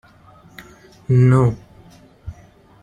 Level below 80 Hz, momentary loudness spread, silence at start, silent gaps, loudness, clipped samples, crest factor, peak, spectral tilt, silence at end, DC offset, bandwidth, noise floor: -46 dBFS; 25 LU; 0.6 s; none; -16 LUFS; under 0.1%; 18 dB; -2 dBFS; -9.5 dB/octave; 0.5 s; under 0.1%; 9.2 kHz; -48 dBFS